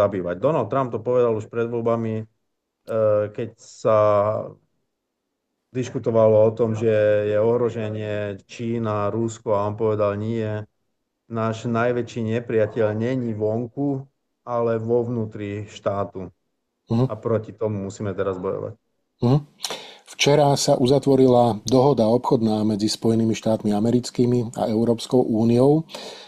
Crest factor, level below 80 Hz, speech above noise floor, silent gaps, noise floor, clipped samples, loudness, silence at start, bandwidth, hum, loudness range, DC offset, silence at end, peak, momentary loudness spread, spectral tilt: 16 dB; -56 dBFS; 57 dB; none; -78 dBFS; under 0.1%; -22 LUFS; 0 s; 13.5 kHz; none; 7 LU; under 0.1%; 0 s; -4 dBFS; 13 LU; -6.5 dB/octave